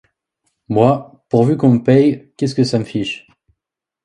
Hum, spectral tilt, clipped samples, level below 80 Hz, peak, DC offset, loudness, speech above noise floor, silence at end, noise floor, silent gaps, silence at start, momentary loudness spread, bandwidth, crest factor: none; -7.5 dB/octave; under 0.1%; -54 dBFS; 0 dBFS; under 0.1%; -16 LUFS; 70 dB; 0.85 s; -84 dBFS; none; 0.7 s; 10 LU; 11 kHz; 16 dB